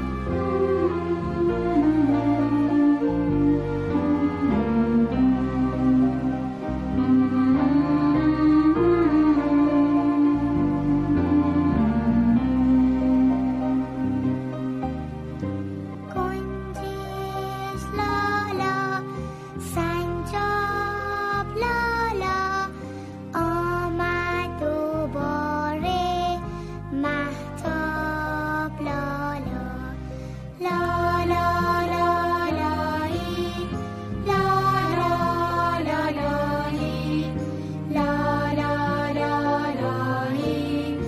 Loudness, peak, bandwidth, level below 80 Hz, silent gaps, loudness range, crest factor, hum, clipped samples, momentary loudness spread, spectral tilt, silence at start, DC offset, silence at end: -24 LUFS; -10 dBFS; 14 kHz; -40 dBFS; none; 7 LU; 14 dB; none; under 0.1%; 10 LU; -7.5 dB/octave; 0 s; under 0.1%; 0 s